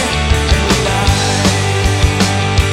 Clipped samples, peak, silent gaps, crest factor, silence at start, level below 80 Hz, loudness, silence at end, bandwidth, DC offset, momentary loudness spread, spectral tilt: under 0.1%; 0 dBFS; none; 12 dB; 0 s; -18 dBFS; -13 LUFS; 0 s; 15.5 kHz; under 0.1%; 1 LU; -4 dB/octave